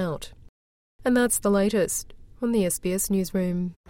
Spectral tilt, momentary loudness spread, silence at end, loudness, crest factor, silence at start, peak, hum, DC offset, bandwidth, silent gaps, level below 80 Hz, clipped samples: -5 dB/octave; 9 LU; 0.15 s; -25 LUFS; 16 dB; 0 s; -10 dBFS; none; under 0.1%; 17 kHz; 0.49-0.99 s; -48 dBFS; under 0.1%